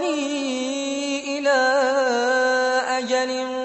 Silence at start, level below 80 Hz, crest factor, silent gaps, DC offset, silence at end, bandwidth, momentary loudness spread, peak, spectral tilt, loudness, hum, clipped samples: 0 s; -68 dBFS; 12 dB; none; under 0.1%; 0 s; 8.4 kHz; 7 LU; -10 dBFS; -1 dB/octave; -21 LUFS; none; under 0.1%